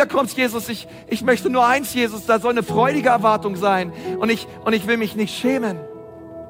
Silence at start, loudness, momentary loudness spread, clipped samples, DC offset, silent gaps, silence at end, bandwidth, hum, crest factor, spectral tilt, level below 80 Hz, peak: 0 s; -19 LUFS; 11 LU; under 0.1%; under 0.1%; none; 0 s; 17 kHz; none; 16 dB; -4.5 dB/octave; -56 dBFS; -2 dBFS